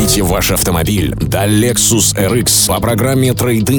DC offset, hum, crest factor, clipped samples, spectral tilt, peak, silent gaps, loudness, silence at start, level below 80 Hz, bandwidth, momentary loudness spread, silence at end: under 0.1%; none; 12 dB; under 0.1%; -4 dB/octave; 0 dBFS; none; -12 LUFS; 0 s; -28 dBFS; over 20 kHz; 5 LU; 0 s